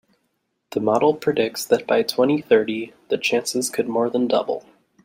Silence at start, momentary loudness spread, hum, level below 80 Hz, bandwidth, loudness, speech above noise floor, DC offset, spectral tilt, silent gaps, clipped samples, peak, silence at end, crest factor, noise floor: 0.7 s; 9 LU; none; -68 dBFS; 16.5 kHz; -21 LUFS; 52 dB; under 0.1%; -4 dB/octave; none; under 0.1%; -4 dBFS; 0.45 s; 18 dB; -72 dBFS